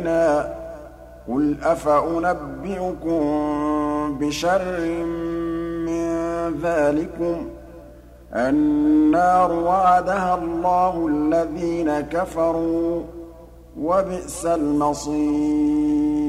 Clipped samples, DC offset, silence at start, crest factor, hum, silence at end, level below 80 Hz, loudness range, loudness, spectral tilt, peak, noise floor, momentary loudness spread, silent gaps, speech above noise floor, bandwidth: under 0.1%; under 0.1%; 0 s; 14 dB; 60 Hz at -45 dBFS; 0 s; -44 dBFS; 5 LU; -21 LUFS; -6 dB/octave; -6 dBFS; -43 dBFS; 11 LU; none; 23 dB; 13 kHz